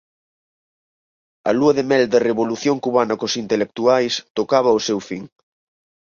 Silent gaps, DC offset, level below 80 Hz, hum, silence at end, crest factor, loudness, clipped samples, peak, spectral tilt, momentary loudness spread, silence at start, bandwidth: 4.30-4.35 s; under 0.1%; -62 dBFS; none; 0.75 s; 18 dB; -18 LUFS; under 0.1%; -2 dBFS; -4.5 dB/octave; 7 LU; 1.45 s; 7.4 kHz